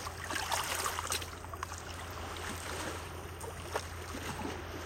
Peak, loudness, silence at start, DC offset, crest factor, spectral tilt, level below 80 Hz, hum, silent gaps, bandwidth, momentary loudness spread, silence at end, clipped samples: -18 dBFS; -38 LUFS; 0 s; under 0.1%; 22 dB; -2.5 dB/octave; -52 dBFS; none; none; 16.5 kHz; 9 LU; 0 s; under 0.1%